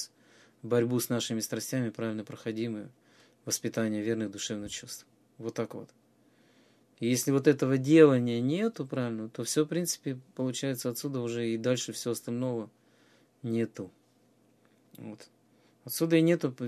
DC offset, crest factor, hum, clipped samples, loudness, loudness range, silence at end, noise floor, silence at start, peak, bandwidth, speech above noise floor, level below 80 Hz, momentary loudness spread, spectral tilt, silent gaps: under 0.1%; 22 dB; none; under 0.1%; -30 LUFS; 11 LU; 0 s; -66 dBFS; 0 s; -8 dBFS; 15 kHz; 37 dB; -74 dBFS; 19 LU; -5 dB/octave; none